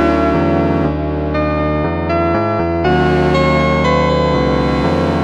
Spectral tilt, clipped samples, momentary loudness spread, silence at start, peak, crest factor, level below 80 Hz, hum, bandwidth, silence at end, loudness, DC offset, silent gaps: -7.5 dB/octave; under 0.1%; 4 LU; 0 s; -2 dBFS; 12 dB; -26 dBFS; none; 8.6 kHz; 0 s; -14 LUFS; under 0.1%; none